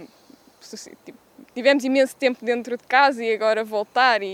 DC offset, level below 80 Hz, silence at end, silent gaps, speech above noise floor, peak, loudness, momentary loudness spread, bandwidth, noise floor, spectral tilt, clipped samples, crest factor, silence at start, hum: under 0.1%; -76 dBFS; 0 s; none; 31 dB; -2 dBFS; -20 LUFS; 21 LU; 15.5 kHz; -52 dBFS; -3 dB/octave; under 0.1%; 20 dB; 0 s; none